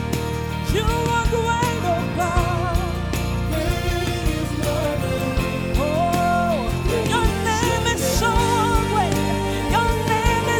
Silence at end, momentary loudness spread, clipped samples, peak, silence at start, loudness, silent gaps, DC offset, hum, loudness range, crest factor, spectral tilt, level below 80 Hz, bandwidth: 0 s; 4 LU; under 0.1%; -4 dBFS; 0 s; -21 LUFS; none; under 0.1%; none; 3 LU; 16 dB; -5 dB/octave; -28 dBFS; over 20 kHz